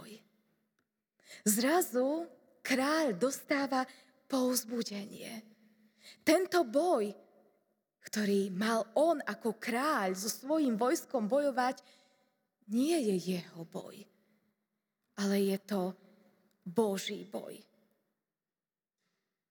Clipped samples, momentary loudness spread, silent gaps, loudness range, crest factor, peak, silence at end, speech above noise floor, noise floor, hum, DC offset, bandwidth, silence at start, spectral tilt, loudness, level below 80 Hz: under 0.1%; 16 LU; none; 6 LU; 22 dB; -14 dBFS; 1.9 s; over 58 dB; under -90 dBFS; none; under 0.1%; over 20 kHz; 0 s; -4 dB/octave; -33 LUFS; under -90 dBFS